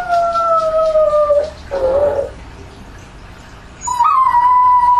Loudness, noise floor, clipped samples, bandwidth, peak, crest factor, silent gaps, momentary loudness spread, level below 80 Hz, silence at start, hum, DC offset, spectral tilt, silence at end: -13 LUFS; -36 dBFS; under 0.1%; 12.5 kHz; -4 dBFS; 12 dB; none; 12 LU; -38 dBFS; 0 s; 60 Hz at -45 dBFS; under 0.1%; -4 dB/octave; 0 s